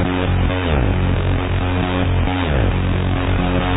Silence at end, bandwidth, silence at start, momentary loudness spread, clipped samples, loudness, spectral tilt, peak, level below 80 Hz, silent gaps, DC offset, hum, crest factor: 0 s; 4 kHz; 0 s; 1 LU; under 0.1%; -18 LUFS; -11 dB/octave; -4 dBFS; -24 dBFS; none; under 0.1%; none; 14 dB